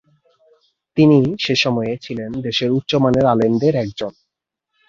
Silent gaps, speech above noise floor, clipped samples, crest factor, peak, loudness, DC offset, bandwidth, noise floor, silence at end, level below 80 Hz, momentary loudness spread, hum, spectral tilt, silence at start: none; 63 dB; under 0.1%; 16 dB; -2 dBFS; -17 LUFS; under 0.1%; 7.4 kHz; -79 dBFS; 0.8 s; -50 dBFS; 13 LU; none; -6.5 dB/octave; 0.95 s